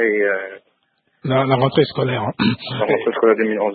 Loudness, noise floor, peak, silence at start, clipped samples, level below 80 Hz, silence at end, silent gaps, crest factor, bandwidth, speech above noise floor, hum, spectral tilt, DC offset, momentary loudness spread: -18 LUFS; -66 dBFS; -2 dBFS; 0 s; under 0.1%; -58 dBFS; 0 s; none; 16 dB; 4.8 kHz; 48 dB; none; -11.5 dB/octave; under 0.1%; 7 LU